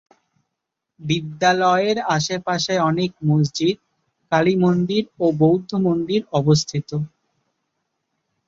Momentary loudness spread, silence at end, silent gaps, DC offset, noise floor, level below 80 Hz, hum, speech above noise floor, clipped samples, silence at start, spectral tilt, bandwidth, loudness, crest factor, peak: 8 LU; 1.4 s; none; under 0.1%; -81 dBFS; -60 dBFS; none; 62 dB; under 0.1%; 1 s; -5.5 dB/octave; 7.8 kHz; -20 LUFS; 18 dB; -4 dBFS